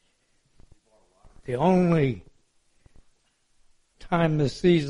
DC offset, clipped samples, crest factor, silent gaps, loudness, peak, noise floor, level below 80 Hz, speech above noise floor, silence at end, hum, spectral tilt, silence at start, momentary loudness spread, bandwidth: under 0.1%; under 0.1%; 18 dB; none; -24 LUFS; -8 dBFS; -67 dBFS; -52 dBFS; 45 dB; 0 s; none; -7.5 dB/octave; 1.45 s; 14 LU; 11 kHz